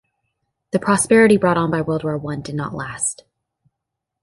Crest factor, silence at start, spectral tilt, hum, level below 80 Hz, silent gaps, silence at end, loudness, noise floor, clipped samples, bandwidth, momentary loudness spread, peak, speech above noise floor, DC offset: 18 dB; 0.75 s; -5 dB/octave; none; -52 dBFS; none; 1.1 s; -18 LUFS; -81 dBFS; under 0.1%; 11.5 kHz; 14 LU; -2 dBFS; 63 dB; under 0.1%